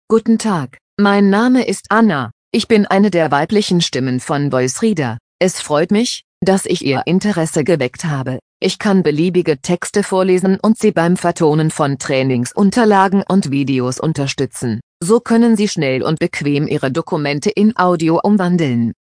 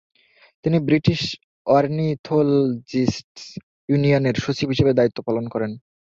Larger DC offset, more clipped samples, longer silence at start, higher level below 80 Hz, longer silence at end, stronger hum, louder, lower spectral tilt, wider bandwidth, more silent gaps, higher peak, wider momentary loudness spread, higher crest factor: neither; neither; second, 0.1 s vs 0.65 s; about the same, -54 dBFS vs -50 dBFS; second, 0.1 s vs 0.25 s; neither; first, -15 LUFS vs -21 LUFS; second, -5.5 dB/octave vs -7 dB/octave; first, 10.5 kHz vs 7.6 kHz; first, 0.81-0.97 s, 2.32-2.51 s, 5.20-5.39 s, 6.24-6.41 s, 8.42-8.60 s, 14.83-15.00 s vs 1.44-1.65 s, 2.19-2.24 s, 3.24-3.35 s, 3.63-3.88 s; first, 0 dBFS vs -4 dBFS; second, 7 LU vs 12 LU; about the same, 14 dB vs 18 dB